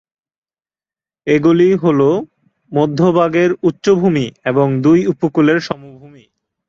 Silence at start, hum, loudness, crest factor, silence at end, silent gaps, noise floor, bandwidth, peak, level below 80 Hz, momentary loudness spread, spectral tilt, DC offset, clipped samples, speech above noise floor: 1.25 s; none; -14 LUFS; 14 dB; 0.6 s; none; under -90 dBFS; 7.4 kHz; -2 dBFS; -54 dBFS; 8 LU; -7.5 dB/octave; under 0.1%; under 0.1%; over 77 dB